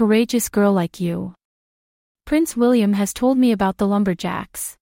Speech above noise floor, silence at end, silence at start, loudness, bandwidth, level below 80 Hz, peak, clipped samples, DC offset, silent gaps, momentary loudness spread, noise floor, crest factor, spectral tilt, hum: over 72 dB; 0.1 s; 0 s; -19 LUFS; 16.5 kHz; -50 dBFS; -4 dBFS; under 0.1%; under 0.1%; 1.45-2.15 s; 10 LU; under -90 dBFS; 14 dB; -5.5 dB/octave; none